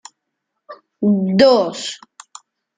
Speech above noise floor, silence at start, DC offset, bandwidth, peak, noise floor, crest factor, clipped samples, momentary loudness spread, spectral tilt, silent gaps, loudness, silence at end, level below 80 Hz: 62 dB; 0.7 s; under 0.1%; 9.4 kHz; -2 dBFS; -77 dBFS; 18 dB; under 0.1%; 16 LU; -5.5 dB/octave; none; -16 LUFS; 0.85 s; -60 dBFS